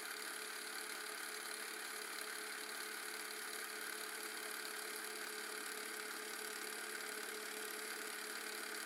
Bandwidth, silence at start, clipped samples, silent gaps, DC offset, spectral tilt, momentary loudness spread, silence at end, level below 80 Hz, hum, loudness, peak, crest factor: 17.5 kHz; 0 s; under 0.1%; none; under 0.1%; 1 dB/octave; 1 LU; 0 s; under -90 dBFS; none; -45 LUFS; -30 dBFS; 18 dB